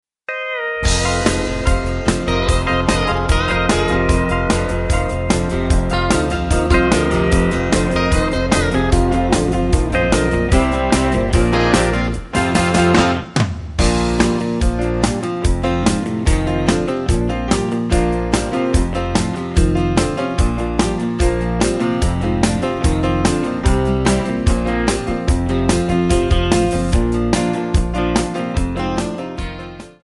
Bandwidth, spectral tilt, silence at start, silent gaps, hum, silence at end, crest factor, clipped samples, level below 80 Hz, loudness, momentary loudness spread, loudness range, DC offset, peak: 11.5 kHz; -5.5 dB/octave; 0.3 s; none; none; 0.15 s; 16 dB; under 0.1%; -22 dBFS; -17 LUFS; 4 LU; 2 LU; under 0.1%; -2 dBFS